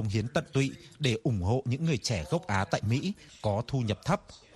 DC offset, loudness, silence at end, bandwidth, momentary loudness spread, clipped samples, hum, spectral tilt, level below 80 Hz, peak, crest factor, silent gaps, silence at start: under 0.1%; -31 LUFS; 0.2 s; 12.5 kHz; 3 LU; under 0.1%; none; -6 dB/octave; -52 dBFS; -12 dBFS; 18 dB; none; 0 s